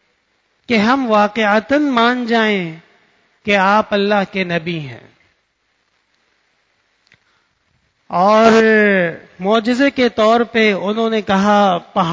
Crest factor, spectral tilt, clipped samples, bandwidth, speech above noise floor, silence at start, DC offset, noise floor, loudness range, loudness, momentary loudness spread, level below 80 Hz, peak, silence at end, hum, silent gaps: 16 dB; -5.5 dB/octave; under 0.1%; 8 kHz; 51 dB; 0.7 s; under 0.1%; -65 dBFS; 10 LU; -14 LUFS; 10 LU; -54 dBFS; 0 dBFS; 0 s; none; none